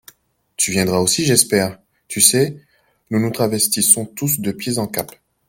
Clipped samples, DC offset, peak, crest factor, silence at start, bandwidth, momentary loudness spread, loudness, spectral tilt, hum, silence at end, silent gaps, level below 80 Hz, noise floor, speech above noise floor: under 0.1%; under 0.1%; 0 dBFS; 18 dB; 0.6 s; 17 kHz; 12 LU; -16 LUFS; -3 dB/octave; none; 0.4 s; none; -54 dBFS; -54 dBFS; 36 dB